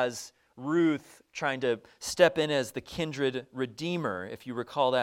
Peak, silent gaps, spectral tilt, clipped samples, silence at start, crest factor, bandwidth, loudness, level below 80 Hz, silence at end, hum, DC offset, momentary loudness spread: -6 dBFS; none; -4.5 dB/octave; under 0.1%; 0 s; 24 dB; 16.5 kHz; -30 LUFS; -64 dBFS; 0 s; none; under 0.1%; 13 LU